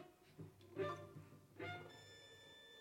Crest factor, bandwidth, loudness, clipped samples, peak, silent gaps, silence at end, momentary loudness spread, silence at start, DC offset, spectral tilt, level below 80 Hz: 22 dB; 16.5 kHz; -53 LUFS; under 0.1%; -32 dBFS; none; 0 s; 14 LU; 0 s; under 0.1%; -5.5 dB/octave; -84 dBFS